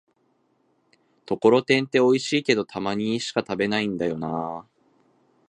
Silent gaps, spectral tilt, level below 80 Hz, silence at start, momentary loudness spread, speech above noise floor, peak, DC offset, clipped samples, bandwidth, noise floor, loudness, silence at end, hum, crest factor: none; -5 dB/octave; -64 dBFS; 1.3 s; 10 LU; 45 dB; -4 dBFS; under 0.1%; under 0.1%; 10.5 kHz; -67 dBFS; -23 LUFS; 0.85 s; none; 20 dB